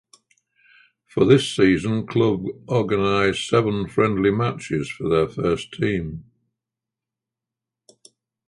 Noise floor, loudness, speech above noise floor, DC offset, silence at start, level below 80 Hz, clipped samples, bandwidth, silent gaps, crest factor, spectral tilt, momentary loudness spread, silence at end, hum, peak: -87 dBFS; -21 LUFS; 67 dB; under 0.1%; 1.15 s; -48 dBFS; under 0.1%; 11.5 kHz; none; 20 dB; -6.5 dB/octave; 10 LU; 2.25 s; none; -2 dBFS